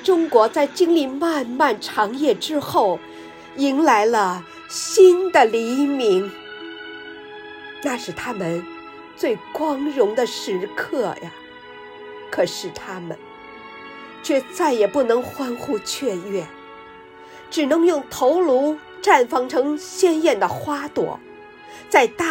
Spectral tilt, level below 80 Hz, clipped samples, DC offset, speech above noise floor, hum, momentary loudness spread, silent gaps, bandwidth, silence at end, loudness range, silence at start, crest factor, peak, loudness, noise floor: -4 dB/octave; -64 dBFS; under 0.1%; under 0.1%; 23 dB; none; 21 LU; none; 16.5 kHz; 0 s; 10 LU; 0 s; 20 dB; 0 dBFS; -20 LUFS; -42 dBFS